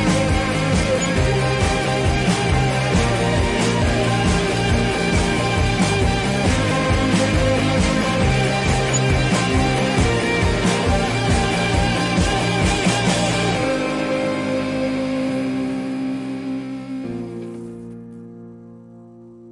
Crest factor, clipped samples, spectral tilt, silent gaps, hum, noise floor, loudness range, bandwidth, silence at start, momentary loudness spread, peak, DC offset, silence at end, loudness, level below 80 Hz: 14 dB; under 0.1%; -5 dB/octave; none; none; -42 dBFS; 7 LU; 11.5 kHz; 0 s; 10 LU; -6 dBFS; under 0.1%; 0 s; -19 LUFS; -30 dBFS